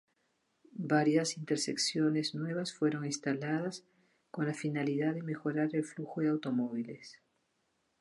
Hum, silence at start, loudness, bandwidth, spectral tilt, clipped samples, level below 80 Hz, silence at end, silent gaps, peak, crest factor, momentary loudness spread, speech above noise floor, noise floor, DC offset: none; 0.75 s; -34 LUFS; 11.5 kHz; -5 dB/octave; under 0.1%; -84 dBFS; 0.9 s; none; -16 dBFS; 18 dB; 12 LU; 45 dB; -78 dBFS; under 0.1%